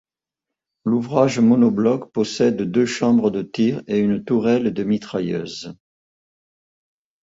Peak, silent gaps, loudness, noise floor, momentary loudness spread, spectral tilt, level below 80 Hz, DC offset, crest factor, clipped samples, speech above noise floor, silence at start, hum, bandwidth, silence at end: -4 dBFS; none; -19 LUFS; -85 dBFS; 10 LU; -6.5 dB/octave; -58 dBFS; under 0.1%; 18 dB; under 0.1%; 67 dB; 0.85 s; none; 7.8 kHz; 1.5 s